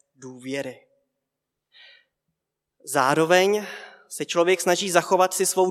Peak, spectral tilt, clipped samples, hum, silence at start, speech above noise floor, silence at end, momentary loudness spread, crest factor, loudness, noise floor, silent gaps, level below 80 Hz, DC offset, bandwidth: -2 dBFS; -3 dB/octave; under 0.1%; none; 0.2 s; 61 dB; 0 s; 20 LU; 24 dB; -21 LUFS; -83 dBFS; none; -84 dBFS; under 0.1%; 16 kHz